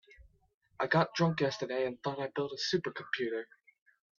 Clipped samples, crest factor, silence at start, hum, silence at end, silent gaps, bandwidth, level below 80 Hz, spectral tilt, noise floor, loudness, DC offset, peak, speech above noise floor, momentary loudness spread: under 0.1%; 20 dB; 0.2 s; none; 0.75 s; 0.54-0.61 s; 7.4 kHz; -70 dBFS; -5.5 dB/octave; -61 dBFS; -33 LUFS; under 0.1%; -16 dBFS; 28 dB; 8 LU